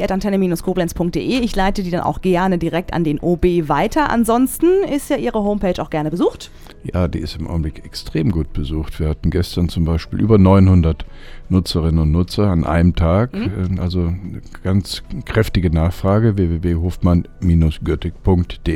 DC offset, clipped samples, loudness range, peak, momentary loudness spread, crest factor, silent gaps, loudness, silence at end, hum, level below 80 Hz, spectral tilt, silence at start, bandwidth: under 0.1%; under 0.1%; 6 LU; 0 dBFS; 9 LU; 16 dB; none; -18 LUFS; 0 s; none; -28 dBFS; -7 dB/octave; 0 s; 16.5 kHz